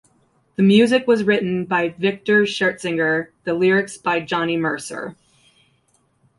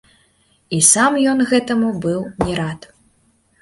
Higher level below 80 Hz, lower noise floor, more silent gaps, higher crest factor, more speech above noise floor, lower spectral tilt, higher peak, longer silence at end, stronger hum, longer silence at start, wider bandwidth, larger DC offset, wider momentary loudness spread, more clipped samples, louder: second, -62 dBFS vs -46 dBFS; first, -63 dBFS vs -59 dBFS; neither; about the same, 16 dB vs 18 dB; about the same, 44 dB vs 43 dB; first, -5.5 dB/octave vs -3.5 dB/octave; second, -4 dBFS vs 0 dBFS; first, 1.25 s vs 0.85 s; neither; about the same, 0.6 s vs 0.7 s; about the same, 11.5 kHz vs 12 kHz; neither; about the same, 11 LU vs 13 LU; neither; second, -19 LUFS vs -16 LUFS